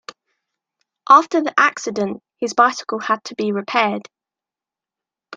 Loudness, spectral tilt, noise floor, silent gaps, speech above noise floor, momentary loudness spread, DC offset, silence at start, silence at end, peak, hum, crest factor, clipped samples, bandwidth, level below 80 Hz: -18 LUFS; -3.5 dB/octave; -89 dBFS; none; 71 dB; 12 LU; under 0.1%; 1.1 s; 0 s; 0 dBFS; none; 20 dB; under 0.1%; 9.2 kHz; -72 dBFS